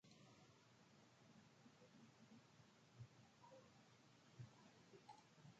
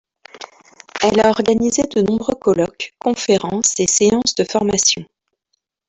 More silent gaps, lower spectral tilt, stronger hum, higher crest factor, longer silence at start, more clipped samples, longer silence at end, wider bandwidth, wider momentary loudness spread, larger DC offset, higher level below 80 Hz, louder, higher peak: neither; first, -5 dB/octave vs -3 dB/octave; neither; about the same, 20 dB vs 16 dB; second, 0.05 s vs 0.35 s; neither; second, 0 s vs 0.85 s; second, 7.6 kHz vs 8.4 kHz; second, 5 LU vs 9 LU; neither; second, under -90 dBFS vs -50 dBFS; second, -67 LUFS vs -16 LUFS; second, -48 dBFS vs -2 dBFS